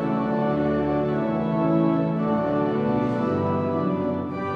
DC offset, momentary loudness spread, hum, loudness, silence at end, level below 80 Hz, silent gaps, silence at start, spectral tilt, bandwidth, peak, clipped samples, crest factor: under 0.1%; 3 LU; none; -23 LUFS; 0 s; -50 dBFS; none; 0 s; -10 dB/octave; 6.2 kHz; -10 dBFS; under 0.1%; 12 dB